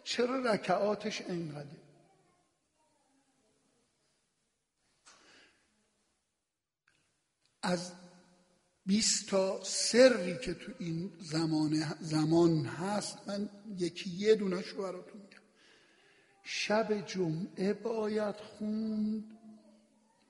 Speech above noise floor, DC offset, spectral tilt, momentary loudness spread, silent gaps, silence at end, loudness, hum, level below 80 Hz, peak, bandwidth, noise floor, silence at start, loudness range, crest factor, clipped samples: 56 dB; under 0.1%; -4.5 dB/octave; 14 LU; none; 0.7 s; -33 LUFS; none; -70 dBFS; -12 dBFS; 11.5 kHz; -89 dBFS; 0.05 s; 14 LU; 24 dB; under 0.1%